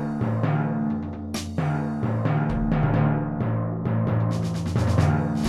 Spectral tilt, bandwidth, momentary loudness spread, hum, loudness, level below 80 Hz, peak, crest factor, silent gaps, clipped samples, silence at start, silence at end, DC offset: -8 dB/octave; 12 kHz; 6 LU; none; -25 LUFS; -40 dBFS; -6 dBFS; 18 dB; none; under 0.1%; 0 s; 0 s; 0.2%